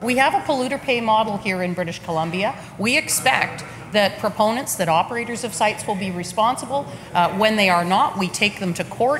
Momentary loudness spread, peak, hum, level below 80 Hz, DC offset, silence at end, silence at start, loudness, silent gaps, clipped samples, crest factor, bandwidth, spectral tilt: 8 LU; 0 dBFS; none; -54 dBFS; under 0.1%; 0 s; 0 s; -20 LUFS; none; under 0.1%; 20 dB; 16.5 kHz; -3.5 dB/octave